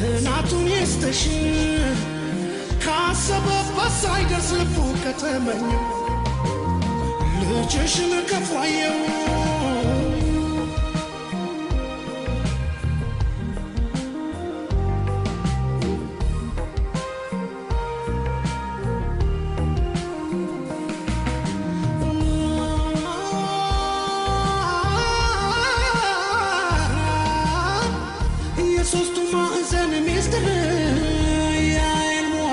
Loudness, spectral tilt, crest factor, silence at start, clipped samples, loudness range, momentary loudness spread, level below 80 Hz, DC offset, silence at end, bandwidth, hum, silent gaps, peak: -23 LUFS; -5 dB/octave; 12 dB; 0 s; under 0.1%; 5 LU; 7 LU; -28 dBFS; under 0.1%; 0 s; 11.5 kHz; none; none; -10 dBFS